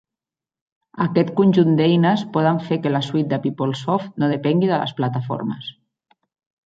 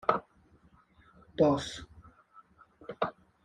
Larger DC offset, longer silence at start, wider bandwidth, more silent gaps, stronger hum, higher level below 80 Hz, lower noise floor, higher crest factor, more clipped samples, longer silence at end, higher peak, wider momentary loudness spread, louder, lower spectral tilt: neither; first, 0.95 s vs 0.05 s; second, 7.8 kHz vs 11.5 kHz; neither; neither; about the same, -64 dBFS vs -62 dBFS; first, -89 dBFS vs -63 dBFS; second, 16 dB vs 26 dB; neither; first, 0.95 s vs 0.35 s; first, -4 dBFS vs -10 dBFS; second, 9 LU vs 22 LU; first, -20 LUFS vs -31 LUFS; first, -8 dB/octave vs -6 dB/octave